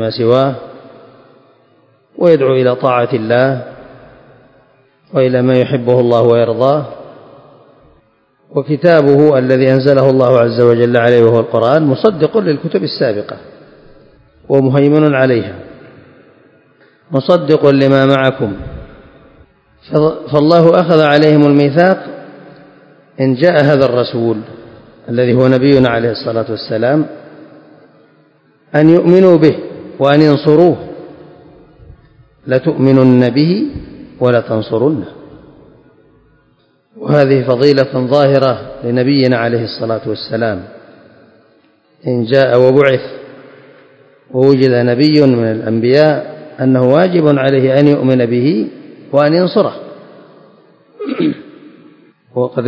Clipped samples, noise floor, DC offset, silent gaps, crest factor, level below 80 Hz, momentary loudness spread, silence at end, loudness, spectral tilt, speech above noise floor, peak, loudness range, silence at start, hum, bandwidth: 0.6%; -54 dBFS; under 0.1%; none; 12 dB; -48 dBFS; 13 LU; 0 s; -11 LUFS; -9 dB/octave; 44 dB; 0 dBFS; 5 LU; 0 s; none; 8 kHz